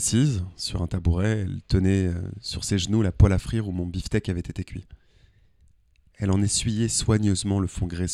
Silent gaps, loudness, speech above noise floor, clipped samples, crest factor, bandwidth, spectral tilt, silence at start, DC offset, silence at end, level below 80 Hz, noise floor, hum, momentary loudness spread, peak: none; -25 LUFS; 36 dB; under 0.1%; 22 dB; 12.5 kHz; -5.5 dB/octave; 0 s; under 0.1%; 0 s; -36 dBFS; -59 dBFS; none; 10 LU; -2 dBFS